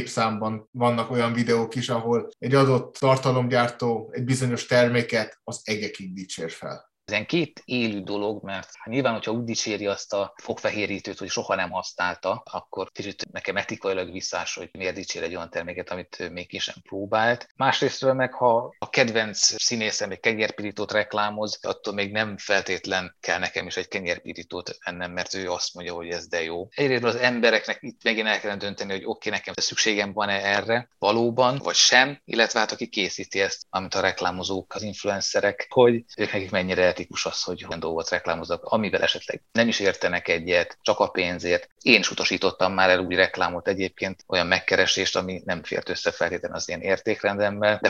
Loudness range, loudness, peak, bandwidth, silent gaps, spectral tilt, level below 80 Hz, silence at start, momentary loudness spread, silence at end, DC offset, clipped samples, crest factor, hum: 7 LU; -24 LUFS; 0 dBFS; 12 kHz; 0.67-0.73 s, 17.51-17.55 s, 41.72-41.76 s; -3.5 dB/octave; -66 dBFS; 0 s; 11 LU; 0 s; under 0.1%; under 0.1%; 24 dB; none